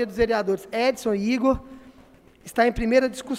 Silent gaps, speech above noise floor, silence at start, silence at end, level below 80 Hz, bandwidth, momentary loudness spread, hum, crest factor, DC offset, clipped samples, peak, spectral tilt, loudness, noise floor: none; 30 dB; 0 s; 0 s; -44 dBFS; 15.5 kHz; 5 LU; none; 18 dB; under 0.1%; under 0.1%; -6 dBFS; -5 dB/octave; -23 LUFS; -52 dBFS